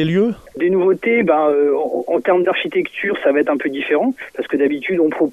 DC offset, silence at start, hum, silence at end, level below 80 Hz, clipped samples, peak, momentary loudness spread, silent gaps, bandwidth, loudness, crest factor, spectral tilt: under 0.1%; 0 s; none; 0 s; -58 dBFS; under 0.1%; 0 dBFS; 6 LU; none; 10 kHz; -17 LUFS; 16 dB; -7.5 dB/octave